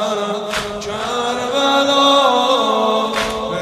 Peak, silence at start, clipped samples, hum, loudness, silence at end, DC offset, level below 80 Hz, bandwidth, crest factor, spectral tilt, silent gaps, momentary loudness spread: -2 dBFS; 0 s; under 0.1%; none; -16 LUFS; 0 s; under 0.1%; -46 dBFS; 13.5 kHz; 16 dB; -3 dB/octave; none; 10 LU